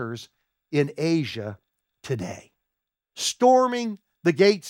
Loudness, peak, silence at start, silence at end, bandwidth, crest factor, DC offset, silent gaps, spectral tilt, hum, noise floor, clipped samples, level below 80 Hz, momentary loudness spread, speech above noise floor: -24 LUFS; -6 dBFS; 0 s; 0 s; 16 kHz; 20 dB; under 0.1%; none; -5 dB/octave; none; -85 dBFS; under 0.1%; -72 dBFS; 20 LU; 62 dB